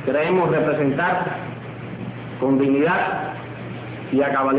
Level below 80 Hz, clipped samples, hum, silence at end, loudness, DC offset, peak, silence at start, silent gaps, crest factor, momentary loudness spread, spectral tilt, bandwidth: -54 dBFS; under 0.1%; none; 0 s; -20 LUFS; under 0.1%; -8 dBFS; 0 s; none; 12 dB; 14 LU; -11 dB/octave; 4 kHz